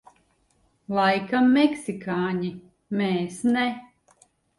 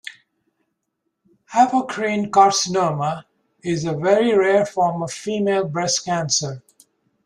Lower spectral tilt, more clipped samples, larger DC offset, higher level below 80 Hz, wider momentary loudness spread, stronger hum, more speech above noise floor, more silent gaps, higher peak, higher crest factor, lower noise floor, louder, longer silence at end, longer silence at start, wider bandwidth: first, -6 dB/octave vs -4 dB/octave; neither; neither; about the same, -64 dBFS vs -62 dBFS; about the same, 12 LU vs 11 LU; neither; second, 43 dB vs 57 dB; neither; second, -8 dBFS vs -2 dBFS; about the same, 18 dB vs 18 dB; second, -66 dBFS vs -76 dBFS; second, -24 LUFS vs -19 LUFS; about the same, 0.75 s vs 0.65 s; first, 0.9 s vs 0.05 s; about the same, 11.5 kHz vs 12.5 kHz